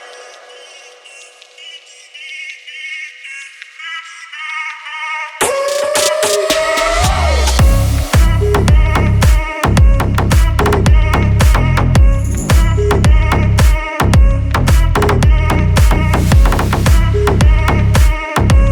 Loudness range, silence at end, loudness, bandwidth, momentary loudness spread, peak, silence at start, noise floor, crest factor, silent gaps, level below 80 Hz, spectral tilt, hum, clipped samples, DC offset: 14 LU; 0 s; -12 LUFS; 19 kHz; 15 LU; 0 dBFS; 0 s; -38 dBFS; 12 dB; none; -14 dBFS; -5 dB/octave; none; under 0.1%; under 0.1%